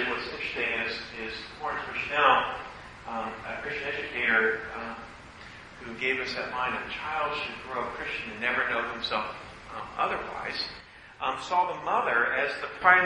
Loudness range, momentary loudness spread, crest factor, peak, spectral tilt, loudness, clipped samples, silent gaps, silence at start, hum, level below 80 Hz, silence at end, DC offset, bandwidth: 4 LU; 17 LU; 24 dB; -6 dBFS; -3.5 dB/octave; -29 LUFS; under 0.1%; none; 0 s; none; -58 dBFS; 0 s; under 0.1%; 11 kHz